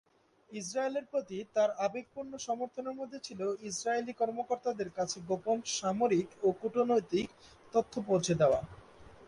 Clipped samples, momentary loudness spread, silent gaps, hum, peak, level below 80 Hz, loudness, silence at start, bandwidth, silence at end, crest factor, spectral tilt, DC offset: under 0.1%; 12 LU; none; none; -16 dBFS; -66 dBFS; -33 LUFS; 0.5 s; 11.5 kHz; 0 s; 18 dB; -4.5 dB/octave; under 0.1%